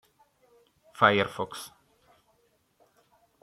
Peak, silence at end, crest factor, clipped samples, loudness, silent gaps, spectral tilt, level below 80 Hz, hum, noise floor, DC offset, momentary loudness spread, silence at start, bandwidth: -6 dBFS; 1.75 s; 26 dB; under 0.1%; -26 LUFS; none; -4.5 dB/octave; -72 dBFS; none; -69 dBFS; under 0.1%; 20 LU; 1 s; 15 kHz